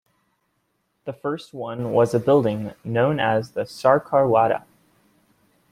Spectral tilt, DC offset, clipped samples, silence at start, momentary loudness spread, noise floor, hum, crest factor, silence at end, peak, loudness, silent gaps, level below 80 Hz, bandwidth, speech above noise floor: -7 dB/octave; under 0.1%; under 0.1%; 1.05 s; 13 LU; -71 dBFS; none; 20 dB; 1.1 s; -2 dBFS; -21 LUFS; none; -60 dBFS; 14.5 kHz; 51 dB